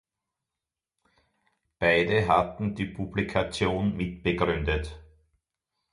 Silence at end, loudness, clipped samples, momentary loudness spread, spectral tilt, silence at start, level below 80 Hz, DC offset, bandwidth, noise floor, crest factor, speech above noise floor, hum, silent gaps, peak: 0.9 s; -27 LUFS; under 0.1%; 8 LU; -6.5 dB/octave; 1.8 s; -44 dBFS; under 0.1%; 11.5 kHz; -89 dBFS; 20 dB; 63 dB; none; none; -8 dBFS